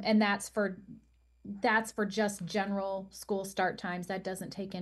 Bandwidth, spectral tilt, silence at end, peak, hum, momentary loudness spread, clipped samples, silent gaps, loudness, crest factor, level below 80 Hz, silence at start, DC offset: 12.5 kHz; -4.5 dB/octave; 0 s; -14 dBFS; none; 11 LU; under 0.1%; none; -33 LUFS; 18 dB; -66 dBFS; 0 s; under 0.1%